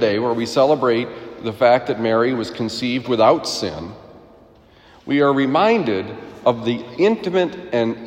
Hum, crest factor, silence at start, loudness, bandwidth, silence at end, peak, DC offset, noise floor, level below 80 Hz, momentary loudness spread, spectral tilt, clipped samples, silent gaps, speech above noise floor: none; 18 dB; 0 s; -19 LUFS; 16 kHz; 0 s; -2 dBFS; under 0.1%; -48 dBFS; -58 dBFS; 12 LU; -5.5 dB/octave; under 0.1%; none; 30 dB